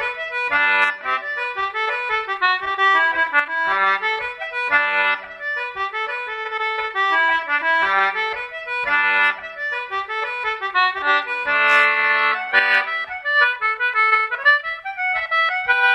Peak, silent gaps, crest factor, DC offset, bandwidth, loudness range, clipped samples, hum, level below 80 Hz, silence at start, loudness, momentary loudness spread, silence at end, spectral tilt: -2 dBFS; none; 18 dB; under 0.1%; 12.5 kHz; 4 LU; under 0.1%; none; -60 dBFS; 0 s; -18 LUFS; 9 LU; 0 s; -1.5 dB/octave